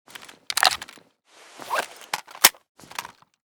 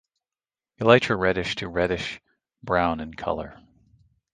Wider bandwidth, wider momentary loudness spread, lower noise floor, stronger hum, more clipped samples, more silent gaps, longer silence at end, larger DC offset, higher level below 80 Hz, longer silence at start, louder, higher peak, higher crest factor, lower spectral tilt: first, over 20 kHz vs 9.6 kHz; first, 25 LU vs 17 LU; second, -54 dBFS vs under -90 dBFS; neither; neither; first, 2.69-2.75 s vs none; second, 0.55 s vs 0.8 s; neither; second, -66 dBFS vs -48 dBFS; second, 0.2 s vs 0.8 s; about the same, -22 LUFS vs -24 LUFS; about the same, 0 dBFS vs 0 dBFS; about the same, 28 dB vs 26 dB; second, 1.5 dB/octave vs -5.5 dB/octave